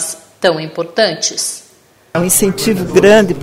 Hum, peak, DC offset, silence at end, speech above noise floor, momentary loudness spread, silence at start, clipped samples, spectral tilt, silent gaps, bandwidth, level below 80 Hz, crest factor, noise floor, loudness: none; 0 dBFS; under 0.1%; 0 s; 35 dB; 12 LU; 0 s; 0.1%; -3.5 dB/octave; none; 16.5 kHz; -44 dBFS; 14 dB; -47 dBFS; -13 LUFS